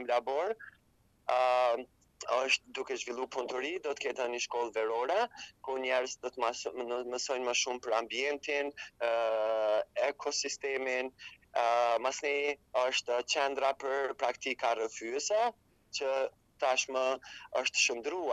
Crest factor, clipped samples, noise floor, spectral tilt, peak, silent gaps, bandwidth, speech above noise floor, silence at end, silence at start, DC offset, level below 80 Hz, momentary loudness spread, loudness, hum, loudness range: 20 dB; under 0.1%; -69 dBFS; -0.5 dB/octave; -14 dBFS; none; 11.5 kHz; 36 dB; 0 s; 0 s; under 0.1%; -74 dBFS; 8 LU; -33 LUFS; none; 2 LU